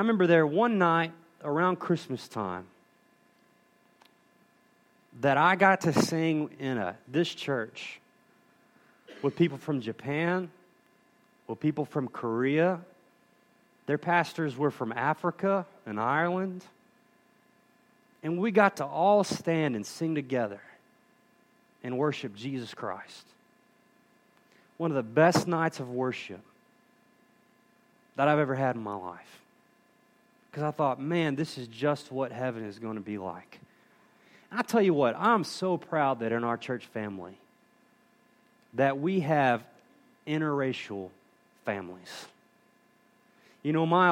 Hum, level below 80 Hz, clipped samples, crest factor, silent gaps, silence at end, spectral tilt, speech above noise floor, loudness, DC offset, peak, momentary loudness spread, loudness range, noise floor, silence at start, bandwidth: 60 Hz at -65 dBFS; -76 dBFS; under 0.1%; 24 dB; none; 0 s; -6 dB/octave; 37 dB; -29 LUFS; under 0.1%; -8 dBFS; 17 LU; 8 LU; -65 dBFS; 0 s; 16.5 kHz